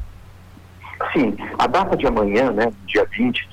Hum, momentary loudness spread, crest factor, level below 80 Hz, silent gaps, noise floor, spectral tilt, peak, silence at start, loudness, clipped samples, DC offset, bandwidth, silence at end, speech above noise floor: none; 7 LU; 10 dB; -40 dBFS; none; -43 dBFS; -6 dB/octave; -10 dBFS; 0 s; -19 LUFS; under 0.1%; under 0.1%; 19 kHz; 0 s; 24 dB